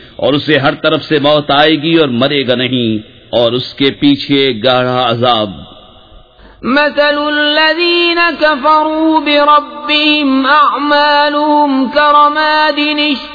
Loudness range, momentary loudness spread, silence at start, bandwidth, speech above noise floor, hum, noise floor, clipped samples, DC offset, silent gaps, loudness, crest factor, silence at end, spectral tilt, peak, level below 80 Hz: 4 LU; 5 LU; 0 s; 5.4 kHz; 29 dB; none; -39 dBFS; under 0.1%; under 0.1%; none; -10 LUFS; 10 dB; 0 s; -6.5 dB/octave; 0 dBFS; -46 dBFS